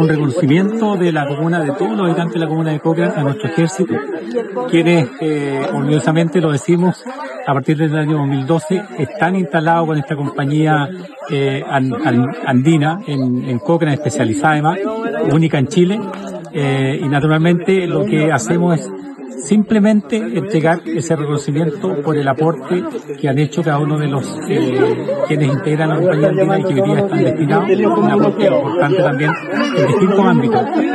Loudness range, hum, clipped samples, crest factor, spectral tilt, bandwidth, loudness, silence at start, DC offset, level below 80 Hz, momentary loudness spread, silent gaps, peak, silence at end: 3 LU; none; under 0.1%; 14 dB; -7 dB/octave; 12 kHz; -15 LUFS; 0 s; under 0.1%; -58 dBFS; 7 LU; none; 0 dBFS; 0 s